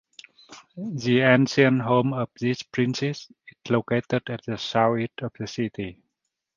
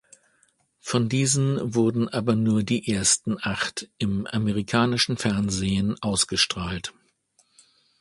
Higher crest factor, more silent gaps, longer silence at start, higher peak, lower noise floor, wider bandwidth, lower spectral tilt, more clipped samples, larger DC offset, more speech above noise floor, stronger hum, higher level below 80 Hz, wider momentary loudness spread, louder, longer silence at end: about the same, 22 dB vs 20 dB; neither; second, 0.5 s vs 0.85 s; about the same, -4 dBFS vs -4 dBFS; first, -81 dBFS vs -66 dBFS; second, 7.4 kHz vs 11.5 kHz; first, -6 dB/octave vs -4 dB/octave; neither; neither; first, 57 dB vs 42 dB; neither; second, -62 dBFS vs -50 dBFS; first, 16 LU vs 8 LU; about the same, -24 LUFS vs -24 LUFS; second, 0.65 s vs 1.1 s